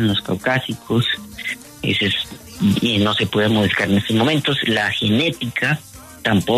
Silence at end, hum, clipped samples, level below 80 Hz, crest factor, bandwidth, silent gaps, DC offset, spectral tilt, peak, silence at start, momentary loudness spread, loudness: 0 s; none; under 0.1%; -50 dBFS; 16 dB; 13.5 kHz; none; under 0.1%; -5 dB/octave; -4 dBFS; 0 s; 8 LU; -19 LUFS